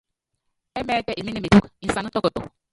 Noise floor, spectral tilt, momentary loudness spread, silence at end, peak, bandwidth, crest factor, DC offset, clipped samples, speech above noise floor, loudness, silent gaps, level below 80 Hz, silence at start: -77 dBFS; -6 dB/octave; 14 LU; 0.25 s; -2 dBFS; 11.5 kHz; 22 dB; under 0.1%; under 0.1%; 55 dB; -22 LUFS; none; -44 dBFS; 0.75 s